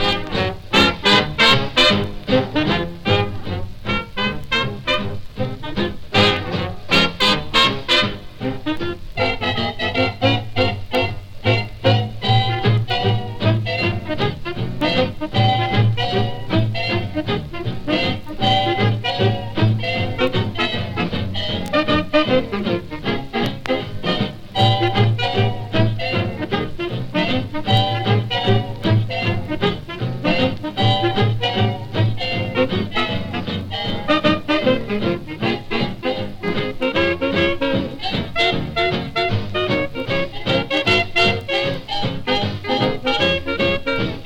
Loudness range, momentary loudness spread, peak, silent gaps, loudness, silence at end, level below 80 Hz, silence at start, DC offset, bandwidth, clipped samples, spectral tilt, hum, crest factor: 3 LU; 8 LU; 0 dBFS; none; -19 LUFS; 0 s; -38 dBFS; 0 s; under 0.1%; 13 kHz; under 0.1%; -6 dB/octave; none; 18 dB